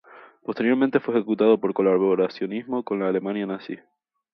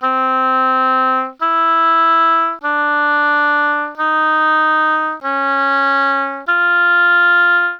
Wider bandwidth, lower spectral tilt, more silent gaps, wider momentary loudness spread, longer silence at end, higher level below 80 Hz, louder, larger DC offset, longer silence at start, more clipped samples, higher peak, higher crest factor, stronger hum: second, 5.8 kHz vs 6.6 kHz; first, -9 dB/octave vs -2.5 dB/octave; neither; first, 14 LU vs 6 LU; first, 0.55 s vs 0 s; about the same, -72 dBFS vs -68 dBFS; second, -23 LUFS vs -13 LUFS; neither; first, 0.15 s vs 0 s; neither; about the same, -4 dBFS vs -4 dBFS; first, 18 dB vs 12 dB; neither